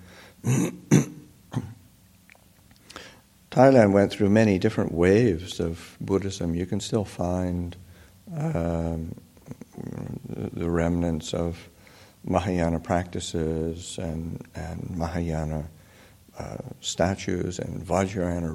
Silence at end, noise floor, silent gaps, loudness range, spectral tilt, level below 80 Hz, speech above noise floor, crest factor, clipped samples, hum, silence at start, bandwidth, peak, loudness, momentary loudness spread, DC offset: 0 s; -55 dBFS; none; 10 LU; -6.5 dB/octave; -46 dBFS; 31 dB; 22 dB; under 0.1%; none; 0 s; 16 kHz; -4 dBFS; -26 LUFS; 18 LU; under 0.1%